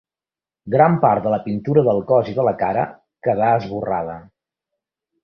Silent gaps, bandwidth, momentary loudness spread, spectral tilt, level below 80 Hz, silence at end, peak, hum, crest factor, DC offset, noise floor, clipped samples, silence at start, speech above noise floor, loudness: none; 6 kHz; 10 LU; -10 dB/octave; -54 dBFS; 1 s; -2 dBFS; none; 18 dB; under 0.1%; under -90 dBFS; under 0.1%; 0.65 s; over 72 dB; -19 LUFS